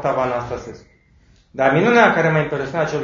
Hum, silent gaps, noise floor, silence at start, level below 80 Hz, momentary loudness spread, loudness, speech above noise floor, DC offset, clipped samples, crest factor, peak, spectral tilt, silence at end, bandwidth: none; none; -53 dBFS; 0 s; -50 dBFS; 18 LU; -17 LUFS; 36 dB; under 0.1%; under 0.1%; 18 dB; 0 dBFS; -6.5 dB/octave; 0 s; 7.4 kHz